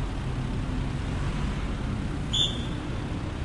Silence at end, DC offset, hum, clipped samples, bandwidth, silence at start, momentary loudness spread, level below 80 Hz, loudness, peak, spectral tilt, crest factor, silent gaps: 0 s; under 0.1%; none; under 0.1%; 11.5 kHz; 0 s; 8 LU; -34 dBFS; -30 LUFS; -12 dBFS; -5 dB/octave; 16 dB; none